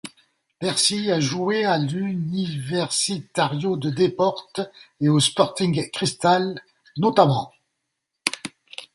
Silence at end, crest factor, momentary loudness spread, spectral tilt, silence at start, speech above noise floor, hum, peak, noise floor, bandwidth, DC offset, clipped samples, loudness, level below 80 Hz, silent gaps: 0.1 s; 22 dB; 13 LU; -4.5 dB/octave; 0.05 s; 57 dB; none; 0 dBFS; -79 dBFS; 11.5 kHz; under 0.1%; under 0.1%; -22 LUFS; -62 dBFS; none